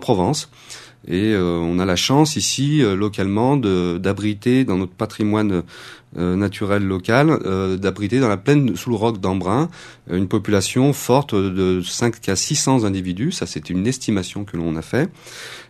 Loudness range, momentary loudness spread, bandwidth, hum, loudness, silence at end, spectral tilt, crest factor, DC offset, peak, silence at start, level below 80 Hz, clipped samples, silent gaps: 3 LU; 9 LU; 13 kHz; none; -19 LUFS; 0.05 s; -5 dB/octave; 20 dB; under 0.1%; 0 dBFS; 0 s; -50 dBFS; under 0.1%; none